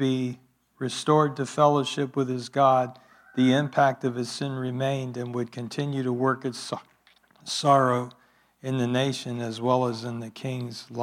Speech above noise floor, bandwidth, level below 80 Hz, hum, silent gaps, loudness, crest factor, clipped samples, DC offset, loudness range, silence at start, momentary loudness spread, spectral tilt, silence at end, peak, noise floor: 35 dB; 14 kHz; -76 dBFS; none; none; -26 LUFS; 20 dB; under 0.1%; under 0.1%; 5 LU; 0 s; 13 LU; -6 dB/octave; 0 s; -6 dBFS; -61 dBFS